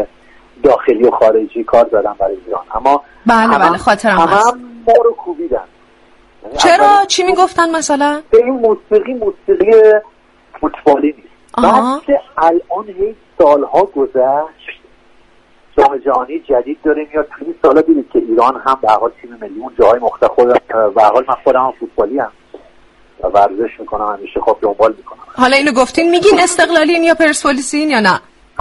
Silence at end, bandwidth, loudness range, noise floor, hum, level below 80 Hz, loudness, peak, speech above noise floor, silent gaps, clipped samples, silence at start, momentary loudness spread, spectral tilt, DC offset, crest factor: 0.4 s; 11.5 kHz; 4 LU; -47 dBFS; none; -42 dBFS; -12 LUFS; 0 dBFS; 35 dB; none; under 0.1%; 0 s; 11 LU; -3.5 dB/octave; under 0.1%; 12 dB